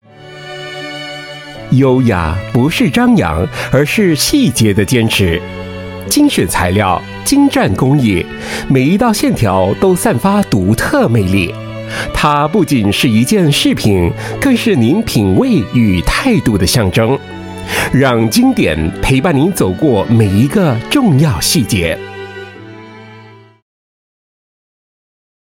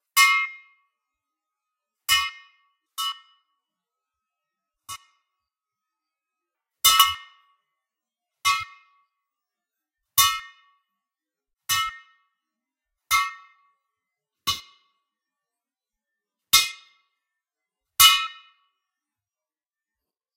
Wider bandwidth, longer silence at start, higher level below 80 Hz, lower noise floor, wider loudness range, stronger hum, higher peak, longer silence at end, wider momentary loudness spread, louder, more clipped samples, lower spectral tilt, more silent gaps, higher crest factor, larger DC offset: about the same, 17 kHz vs 16 kHz; about the same, 0.2 s vs 0.15 s; first, -32 dBFS vs -62 dBFS; second, -38 dBFS vs under -90 dBFS; second, 2 LU vs 9 LU; neither; about the same, 0 dBFS vs 0 dBFS; first, 2.2 s vs 2.05 s; second, 14 LU vs 24 LU; first, -12 LUFS vs -20 LUFS; neither; first, -5.5 dB/octave vs 3 dB/octave; neither; second, 12 dB vs 28 dB; neither